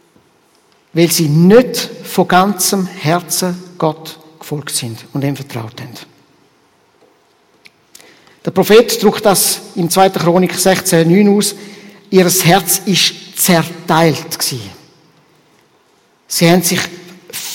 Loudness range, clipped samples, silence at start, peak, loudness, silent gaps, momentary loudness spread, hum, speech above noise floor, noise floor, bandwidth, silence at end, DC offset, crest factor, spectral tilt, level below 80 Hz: 13 LU; 0.3%; 0.95 s; 0 dBFS; -12 LUFS; none; 17 LU; none; 41 dB; -53 dBFS; 17 kHz; 0 s; under 0.1%; 14 dB; -4 dB/octave; -52 dBFS